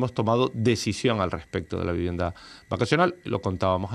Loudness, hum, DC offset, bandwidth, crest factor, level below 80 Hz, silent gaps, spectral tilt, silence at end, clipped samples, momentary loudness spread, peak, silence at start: -26 LUFS; none; under 0.1%; 13 kHz; 20 dB; -48 dBFS; none; -6 dB/octave; 0 s; under 0.1%; 9 LU; -6 dBFS; 0 s